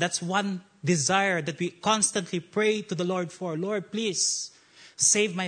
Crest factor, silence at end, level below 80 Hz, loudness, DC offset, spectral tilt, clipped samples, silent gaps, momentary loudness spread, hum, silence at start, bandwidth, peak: 18 dB; 0 s; -72 dBFS; -26 LUFS; under 0.1%; -3 dB/octave; under 0.1%; none; 10 LU; none; 0 s; 9.6 kHz; -10 dBFS